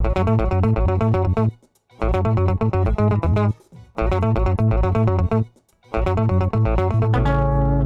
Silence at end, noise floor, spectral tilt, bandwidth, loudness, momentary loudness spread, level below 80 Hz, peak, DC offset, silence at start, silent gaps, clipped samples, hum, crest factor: 0 s; -49 dBFS; -9.5 dB/octave; 5.8 kHz; -20 LUFS; 6 LU; -26 dBFS; -8 dBFS; 0.4%; 0 s; none; under 0.1%; none; 10 dB